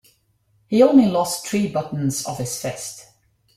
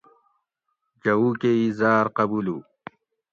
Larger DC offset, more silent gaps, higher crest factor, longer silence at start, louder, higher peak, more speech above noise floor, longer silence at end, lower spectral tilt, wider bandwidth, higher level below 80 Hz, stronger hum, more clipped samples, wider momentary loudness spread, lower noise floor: neither; neither; about the same, 18 dB vs 18 dB; second, 0.7 s vs 1.05 s; about the same, -20 LUFS vs -22 LUFS; first, -2 dBFS vs -8 dBFS; second, 44 dB vs 56 dB; second, 0.55 s vs 0.7 s; second, -5.5 dB/octave vs -8 dB/octave; first, 16 kHz vs 7 kHz; first, -58 dBFS vs -66 dBFS; neither; neither; first, 16 LU vs 9 LU; second, -63 dBFS vs -78 dBFS